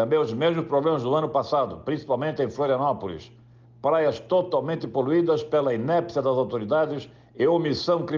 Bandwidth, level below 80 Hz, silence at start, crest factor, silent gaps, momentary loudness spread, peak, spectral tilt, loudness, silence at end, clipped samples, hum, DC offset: 7.2 kHz; -64 dBFS; 0 s; 12 dB; none; 6 LU; -12 dBFS; -7.5 dB/octave; -24 LUFS; 0 s; under 0.1%; none; under 0.1%